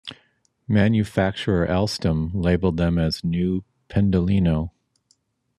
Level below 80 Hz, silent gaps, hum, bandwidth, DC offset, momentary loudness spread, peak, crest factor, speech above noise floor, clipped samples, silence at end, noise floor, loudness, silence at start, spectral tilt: -44 dBFS; none; none; 12.5 kHz; under 0.1%; 7 LU; -6 dBFS; 16 dB; 46 dB; under 0.1%; 0.9 s; -66 dBFS; -22 LUFS; 0.05 s; -7.5 dB/octave